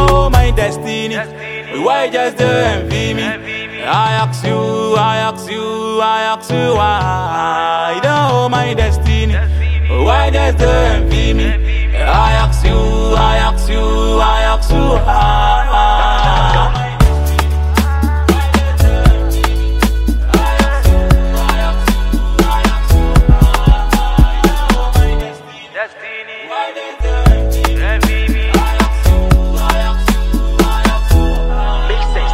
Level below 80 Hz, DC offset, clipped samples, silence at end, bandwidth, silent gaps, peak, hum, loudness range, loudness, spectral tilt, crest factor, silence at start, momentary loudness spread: -14 dBFS; under 0.1%; under 0.1%; 0 s; 16 kHz; none; 0 dBFS; none; 3 LU; -13 LUFS; -5.5 dB/octave; 12 dB; 0 s; 7 LU